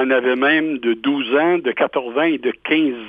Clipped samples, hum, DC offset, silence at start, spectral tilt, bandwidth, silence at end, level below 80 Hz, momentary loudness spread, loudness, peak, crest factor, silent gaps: under 0.1%; none; under 0.1%; 0 s; -7 dB/octave; 4.9 kHz; 0 s; -64 dBFS; 4 LU; -18 LUFS; -4 dBFS; 14 dB; none